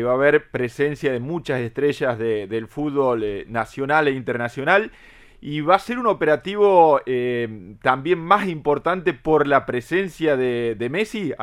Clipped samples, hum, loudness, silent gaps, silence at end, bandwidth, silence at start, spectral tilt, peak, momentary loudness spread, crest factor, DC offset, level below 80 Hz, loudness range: under 0.1%; none; -21 LUFS; none; 0 s; 13.5 kHz; 0 s; -6.5 dB/octave; 0 dBFS; 9 LU; 20 dB; under 0.1%; -52 dBFS; 4 LU